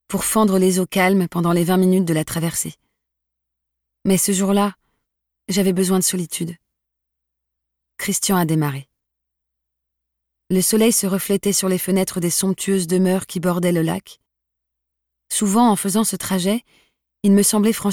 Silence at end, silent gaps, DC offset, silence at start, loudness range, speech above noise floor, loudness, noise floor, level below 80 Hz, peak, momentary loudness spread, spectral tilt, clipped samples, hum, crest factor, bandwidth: 0 s; none; under 0.1%; 0.1 s; 5 LU; 62 dB; -18 LUFS; -80 dBFS; -56 dBFS; -4 dBFS; 8 LU; -4.5 dB/octave; under 0.1%; none; 16 dB; 18.5 kHz